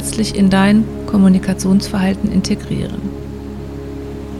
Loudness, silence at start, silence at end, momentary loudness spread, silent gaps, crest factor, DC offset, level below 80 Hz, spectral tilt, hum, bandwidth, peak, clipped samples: -15 LUFS; 0 s; 0 s; 16 LU; none; 14 dB; under 0.1%; -32 dBFS; -6 dB/octave; none; 13 kHz; 0 dBFS; under 0.1%